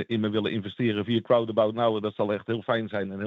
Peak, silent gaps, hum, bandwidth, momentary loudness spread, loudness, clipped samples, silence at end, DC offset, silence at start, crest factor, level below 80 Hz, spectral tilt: -10 dBFS; none; none; 5 kHz; 5 LU; -26 LUFS; under 0.1%; 0 s; under 0.1%; 0 s; 16 dB; -74 dBFS; -8.5 dB/octave